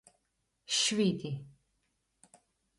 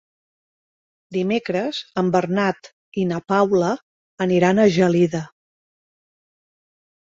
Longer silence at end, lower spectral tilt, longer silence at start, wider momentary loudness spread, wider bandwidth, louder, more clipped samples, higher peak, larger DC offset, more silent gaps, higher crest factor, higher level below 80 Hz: second, 1.3 s vs 1.75 s; second, -3.5 dB/octave vs -6.5 dB/octave; second, 0.7 s vs 1.1 s; about the same, 14 LU vs 14 LU; first, 11.5 kHz vs 7.8 kHz; second, -31 LUFS vs -20 LUFS; neither; second, -18 dBFS vs -4 dBFS; neither; second, none vs 2.73-2.92 s, 3.82-4.17 s; about the same, 18 dB vs 18 dB; second, -74 dBFS vs -60 dBFS